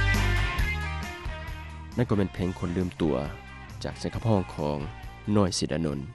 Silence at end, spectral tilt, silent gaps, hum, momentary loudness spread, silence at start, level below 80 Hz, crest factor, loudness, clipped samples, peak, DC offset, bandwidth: 0 s; -5.5 dB/octave; none; none; 13 LU; 0 s; -36 dBFS; 18 dB; -29 LUFS; under 0.1%; -10 dBFS; 0.1%; 13 kHz